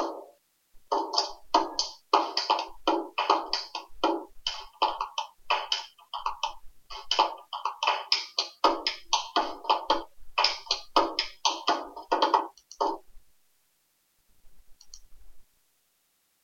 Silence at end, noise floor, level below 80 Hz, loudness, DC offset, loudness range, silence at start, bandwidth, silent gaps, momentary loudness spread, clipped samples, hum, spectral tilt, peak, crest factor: 1 s; -72 dBFS; -58 dBFS; -28 LUFS; under 0.1%; 4 LU; 0 s; 16.5 kHz; none; 9 LU; under 0.1%; none; -0.5 dB/octave; -6 dBFS; 24 dB